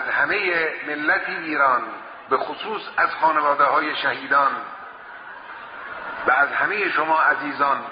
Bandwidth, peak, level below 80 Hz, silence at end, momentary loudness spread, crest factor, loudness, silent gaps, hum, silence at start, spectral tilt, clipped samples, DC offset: 5.2 kHz; -6 dBFS; -66 dBFS; 0 s; 18 LU; 16 dB; -20 LUFS; none; none; 0 s; 0 dB/octave; under 0.1%; under 0.1%